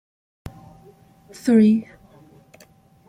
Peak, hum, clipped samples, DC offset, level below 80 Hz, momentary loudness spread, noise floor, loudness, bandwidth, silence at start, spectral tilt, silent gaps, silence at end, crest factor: -6 dBFS; none; under 0.1%; under 0.1%; -56 dBFS; 27 LU; -53 dBFS; -18 LUFS; 10.5 kHz; 0.45 s; -7.5 dB/octave; none; 1.25 s; 18 dB